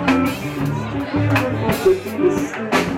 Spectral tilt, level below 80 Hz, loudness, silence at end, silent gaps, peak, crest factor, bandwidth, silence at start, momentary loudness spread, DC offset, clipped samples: -6 dB/octave; -42 dBFS; -19 LUFS; 0 s; none; -4 dBFS; 14 dB; 16.5 kHz; 0 s; 5 LU; under 0.1%; under 0.1%